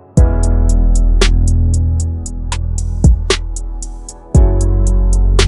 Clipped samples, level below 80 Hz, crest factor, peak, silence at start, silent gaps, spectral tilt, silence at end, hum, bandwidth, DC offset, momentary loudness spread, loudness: under 0.1%; -12 dBFS; 12 dB; 0 dBFS; 0.15 s; none; -5.5 dB/octave; 0 s; none; 11.5 kHz; under 0.1%; 13 LU; -15 LUFS